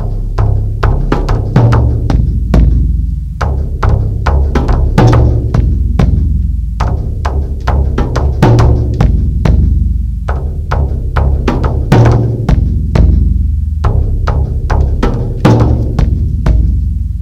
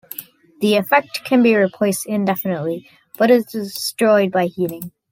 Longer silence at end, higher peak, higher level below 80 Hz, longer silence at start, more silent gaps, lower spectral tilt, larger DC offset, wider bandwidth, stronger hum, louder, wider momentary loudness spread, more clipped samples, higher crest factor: second, 0 s vs 0.25 s; about the same, 0 dBFS vs -2 dBFS; first, -12 dBFS vs -66 dBFS; second, 0 s vs 0.2 s; neither; first, -8.5 dB/octave vs -5 dB/octave; neither; second, 7.8 kHz vs 17 kHz; neither; first, -12 LUFS vs -18 LUFS; second, 8 LU vs 11 LU; first, 0.8% vs under 0.1%; second, 10 dB vs 16 dB